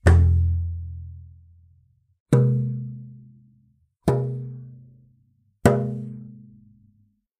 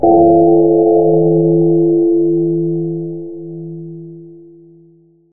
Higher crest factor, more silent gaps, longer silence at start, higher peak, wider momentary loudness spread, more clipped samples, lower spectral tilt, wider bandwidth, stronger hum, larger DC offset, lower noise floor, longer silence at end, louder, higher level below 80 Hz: first, 24 dB vs 12 dB; first, 2.20-2.26 s vs none; about the same, 0.05 s vs 0 s; about the same, 0 dBFS vs 0 dBFS; about the same, 22 LU vs 20 LU; neither; second, -8 dB/octave vs -15.5 dB/octave; first, 11 kHz vs 0.9 kHz; neither; second, under 0.1% vs 1%; first, -63 dBFS vs -48 dBFS; first, 1.05 s vs 0.7 s; second, -23 LUFS vs -12 LUFS; first, -34 dBFS vs -52 dBFS